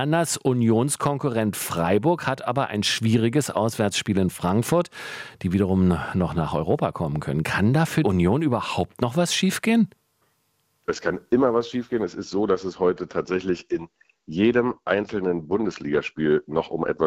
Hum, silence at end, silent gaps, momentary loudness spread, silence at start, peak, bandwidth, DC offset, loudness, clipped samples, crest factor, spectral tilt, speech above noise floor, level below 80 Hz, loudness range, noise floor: none; 0 s; none; 7 LU; 0 s; -6 dBFS; 16.5 kHz; under 0.1%; -23 LUFS; under 0.1%; 18 dB; -5.5 dB/octave; 47 dB; -54 dBFS; 3 LU; -69 dBFS